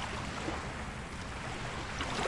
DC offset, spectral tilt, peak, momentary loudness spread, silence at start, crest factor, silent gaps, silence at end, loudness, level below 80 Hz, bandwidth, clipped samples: under 0.1%; -4 dB/octave; -18 dBFS; 4 LU; 0 s; 20 dB; none; 0 s; -39 LUFS; -48 dBFS; 11.5 kHz; under 0.1%